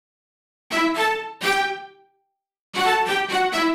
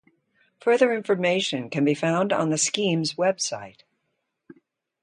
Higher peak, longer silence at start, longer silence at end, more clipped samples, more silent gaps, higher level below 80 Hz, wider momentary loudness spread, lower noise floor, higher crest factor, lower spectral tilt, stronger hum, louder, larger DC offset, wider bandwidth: about the same, -8 dBFS vs -6 dBFS; about the same, 0.7 s vs 0.65 s; second, 0 s vs 1.35 s; neither; first, 2.59-2.73 s vs none; first, -60 dBFS vs -72 dBFS; about the same, 7 LU vs 7 LU; second, -73 dBFS vs -77 dBFS; about the same, 16 dB vs 20 dB; second, -2.5 dB/octave vs -4 dB/octave; neither; about the same, -22 LUFS vs -23 LUFS; neither; first, 16.5 kHz vs 11 kHz